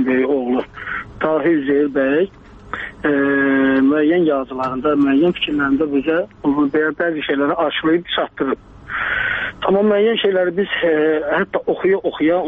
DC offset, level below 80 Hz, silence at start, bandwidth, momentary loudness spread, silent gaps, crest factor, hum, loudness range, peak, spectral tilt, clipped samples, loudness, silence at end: under 0.1%; -48 dBFS; 0 s; 4.6 kHz; 8 LU; none; 14 dB; none; 3 LU; -2 dBFS; -8 dB/octave; under 0.1%; -17 LUFS; 0 s